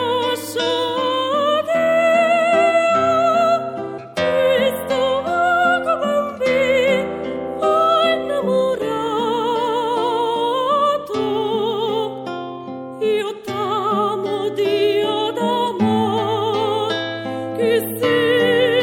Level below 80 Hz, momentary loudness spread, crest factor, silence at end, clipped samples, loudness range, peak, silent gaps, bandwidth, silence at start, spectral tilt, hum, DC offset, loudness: -58 dBFS; 8 LU; 14 dB; 0 s; under 0.1%; 4 LU; -4 dBFS; none; 17 kHz; 0 s; -4.5 dB/octave; none; under 0.1%; -18 LUFS